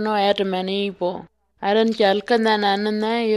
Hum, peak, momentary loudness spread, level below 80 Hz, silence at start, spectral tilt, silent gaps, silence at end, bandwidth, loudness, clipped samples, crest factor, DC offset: none; -4 dBFS; 9 LU; -62 dBFS; 0 s; -5.5 dB/octave; none; 0 s; 12 kHz; -20 LUFS; under 0.1%; 16 dB; under 0.1%